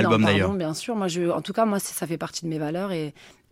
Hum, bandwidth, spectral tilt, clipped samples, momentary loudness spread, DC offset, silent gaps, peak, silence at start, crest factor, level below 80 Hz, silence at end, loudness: none; 16.5 kHz; -5 dB/octave; under 0.1%; 10 LU; under 0.1%; none; -6 dBFS; 0 s; 18 dB; -62 dBFS; 0.2 s; -25 LUFS